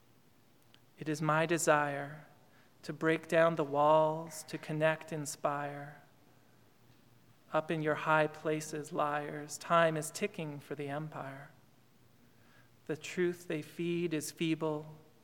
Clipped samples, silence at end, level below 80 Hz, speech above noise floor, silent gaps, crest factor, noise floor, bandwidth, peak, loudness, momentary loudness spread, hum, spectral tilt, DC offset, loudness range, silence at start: under 0.1%; 0.25 s; -82 dBFS; 33 dB; none; 24 dB; -67 dBFS; 18 kHz; -12 dBFS; -34 LUFS; 15 LU; none; -5 dB/octave; under 0.1%; 8 LU; 1 s